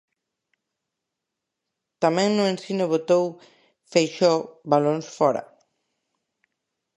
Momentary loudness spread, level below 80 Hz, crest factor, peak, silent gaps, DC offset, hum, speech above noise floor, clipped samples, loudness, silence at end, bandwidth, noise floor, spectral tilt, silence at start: 5 LU; -76 dBFS; 22 dB; -4 dBFS; none; under 0.1%; none; 62 dB; under 0.1%; -23 LUFS; 1.55 s; 11.5 kHz; -84 dBFS; -5.5 dB/octave; 2 s